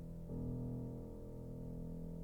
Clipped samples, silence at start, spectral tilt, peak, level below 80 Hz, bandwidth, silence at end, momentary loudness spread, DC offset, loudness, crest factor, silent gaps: under 0.1%; 0 s; -10.5 dB/octave; -34 dBFS; -52 dBFS; 19.5 kHz; 0 s; 7 LU; under 0.1%; -47 LUFS; 12 dB; none